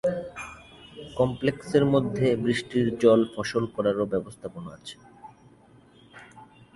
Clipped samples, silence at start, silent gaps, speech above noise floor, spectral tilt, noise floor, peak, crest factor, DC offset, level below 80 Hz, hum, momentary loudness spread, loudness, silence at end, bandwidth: under 0.1%; 0.05 s; none; 30 dB; -6.5 dB/octave; -55 dBFS; -6 dBFS; 20 dB; under 0.1%; -56 dBFS; none; 21 LU; -25 LUFS; 0.3 s; 11.5 kHz